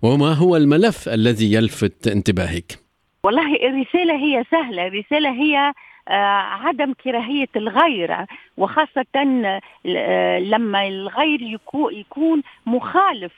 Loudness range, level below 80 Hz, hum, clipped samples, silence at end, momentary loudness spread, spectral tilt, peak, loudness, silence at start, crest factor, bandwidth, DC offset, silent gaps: 2 LU; -50 dBFS; none; under 0.1%; 0.1 s; 8 LU; -6 dB/octave; 0 dBFS; -19 LUFS; 0 s; 18 dB; 13.5 kHz; under 0.1%; none